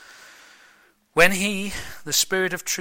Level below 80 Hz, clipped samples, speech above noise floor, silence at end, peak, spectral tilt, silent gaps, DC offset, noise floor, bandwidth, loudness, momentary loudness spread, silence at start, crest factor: -50 dBFS; under 0.1%; 35 dB; 0 s; -4 dBFS; -2 dB/octave; none; under 0.1%; -57 dBFS; 16.5 kHz; -21 LUFS; 12 LU; 0.1 s; 20 dB